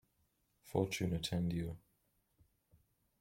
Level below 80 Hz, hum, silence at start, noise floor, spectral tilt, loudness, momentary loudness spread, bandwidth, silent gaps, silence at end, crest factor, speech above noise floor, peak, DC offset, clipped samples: -62 dBFS; none; 0.65 s; -79 dBFS; -5.5 dB/octave; -39 LUFS; 9 LU; 16.5 kHz; none; 1.4 s; 24 dB; 41 dB; -18 dBFS; under 0.1%; under 0.1%